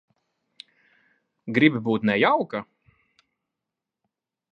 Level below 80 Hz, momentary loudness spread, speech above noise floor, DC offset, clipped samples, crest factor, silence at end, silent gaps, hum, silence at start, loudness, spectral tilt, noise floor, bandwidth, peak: -70 dBFS; 13 LU; 65 dB; under 0.1%; under 0.1%; 24 dB; 1.9 s; none; none; 1.45 s; -22 LUFS; -8 dB/octave; -86 dBFS; 6 kHz; -2 dBFS